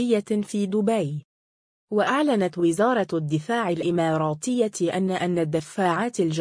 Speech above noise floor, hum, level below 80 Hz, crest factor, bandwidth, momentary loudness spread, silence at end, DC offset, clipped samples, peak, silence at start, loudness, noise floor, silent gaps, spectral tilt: over 67 dB; none; -66 dBFS; 14 dB; 10.5 kHz; 5 LU; 0 s; under 0.1%; under 0.1%; -10 dBFS; 0 s; -24 LUFS; under -90 dBFS; 1.25-1.88 s; -6 dB/octave